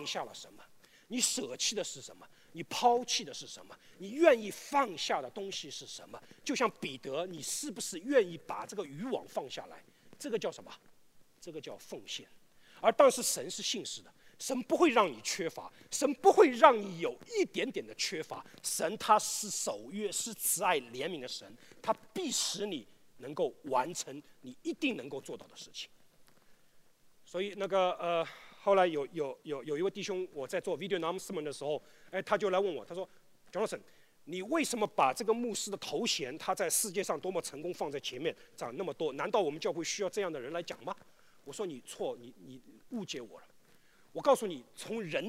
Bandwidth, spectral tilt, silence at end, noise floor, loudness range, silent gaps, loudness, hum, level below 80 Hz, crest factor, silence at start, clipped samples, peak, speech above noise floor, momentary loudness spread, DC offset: 16 kHz; -2.5 dB/octave; 0 s; -62 dBFS; 10 LU; none; -33 LUFS; none; -78 dBFS; 28 dB; 0 s; under 0.1%; -6 dBFS; 28 dB; 17 LU; under 0.1%